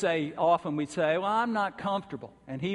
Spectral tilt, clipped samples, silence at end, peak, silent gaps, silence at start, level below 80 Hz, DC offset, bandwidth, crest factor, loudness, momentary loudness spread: -6 dB/octave; under 0.1%; 0 s; -14 dBFS; none; 0 s; -68 dBFS; under 0.1%; 11.5 kHz; 16 dB; -29 LUFS; 13 LU